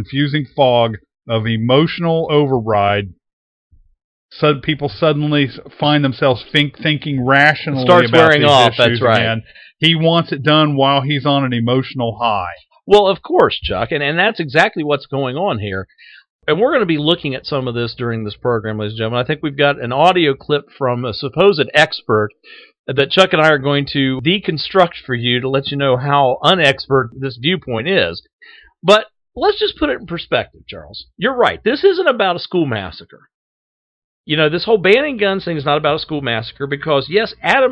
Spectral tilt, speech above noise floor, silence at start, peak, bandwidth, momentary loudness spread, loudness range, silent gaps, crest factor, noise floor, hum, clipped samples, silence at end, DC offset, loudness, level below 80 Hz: -6 dB/octave; over 75 dB; 0 s; 0 dBFS; 11 kHz; 10 LU; 6 LU; 3.33-3.70 s, 4.04-4.29 s, 16.30-16.39 s, 22.79-22.84 s, 28.33-28.39 s, 33.34-34.24 s; 16 dB; under -90 dBFS; none; 0.1%; 0 s; under 0.1%; -15 LUFS; -46 dBFS